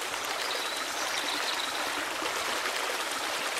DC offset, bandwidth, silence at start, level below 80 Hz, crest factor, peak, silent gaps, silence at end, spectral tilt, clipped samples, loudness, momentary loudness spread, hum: under 0.1%; 16 kHz; 0 s; -68 dBFS; 18 dB; -14 dBFS; none; 0 s; 0.5 dB/octave; under 0.1%; -30 LUFS; 2 LU; none